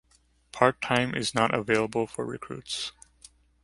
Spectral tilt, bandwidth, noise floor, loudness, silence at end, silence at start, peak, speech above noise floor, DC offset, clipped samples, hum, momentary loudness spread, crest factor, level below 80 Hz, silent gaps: -4.5 dB/octave; 11.5 kHz; -65 dBFS; -27 LUFS; 0.75 s; 0.55 s; -4 dBFS; 38 dB; under 0.1%; under 0.1%; none; 12 LU; 26 dB; -60 dBFS; none